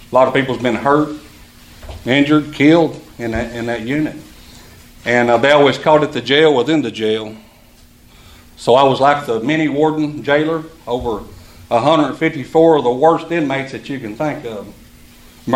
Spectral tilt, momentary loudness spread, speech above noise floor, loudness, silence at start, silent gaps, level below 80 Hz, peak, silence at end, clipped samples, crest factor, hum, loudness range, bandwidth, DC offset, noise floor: -6 dB/octave; 14 LU; 31 dB; -15 LUFS; 0 s; none; -44 dBFS; 0 dBFS; 0 s; under 0.1%; 16 dB; none; 3 LU; 15.5 kHz; under 0.1%; -45 dBFS